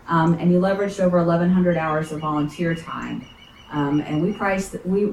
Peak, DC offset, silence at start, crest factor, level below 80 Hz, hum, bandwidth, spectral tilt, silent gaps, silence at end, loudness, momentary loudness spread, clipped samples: -8 dBFS; under 0.1%; 0.05 s; 14 dB; -48 dBFS; none; 12 kHz; -7.5 dB/octave; none; 0 s; -21 LUFS; 11 LU; under 0.1%